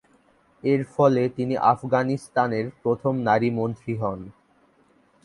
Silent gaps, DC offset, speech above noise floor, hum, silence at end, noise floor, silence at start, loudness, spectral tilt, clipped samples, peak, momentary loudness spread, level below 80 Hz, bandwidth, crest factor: none; under 0.1%; 38 dB; none; 0.95 s; -61 dBFS; 0.65 s; -23 LUFS; -8 dB/octave; under 0.1%; -4 dBFS; 8 LU; -60 dBFS; 11.5 kHz; 20 dB